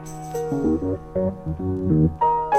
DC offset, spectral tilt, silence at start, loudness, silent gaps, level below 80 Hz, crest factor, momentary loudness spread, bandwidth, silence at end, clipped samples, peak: under 0.1%; -8.5 dB/octave; 0 s; -23 LUFS; none; -38 dBFS; 16 dB; 9 LU; 14.5 kHz; 0 s; under 0.1%; -6 dBFS